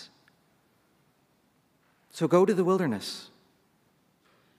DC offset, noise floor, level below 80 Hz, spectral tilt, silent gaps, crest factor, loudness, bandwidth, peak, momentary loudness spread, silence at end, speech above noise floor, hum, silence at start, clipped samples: under 0.1%; -68 dBFS; -82 dBFS; -6.5 dB/octave; none; 22 dB; -26 LUFS; 15 kHz; -8 dBFS; 22 LU; 1.35 s; 43 dB; none; 0 s; under 0.1%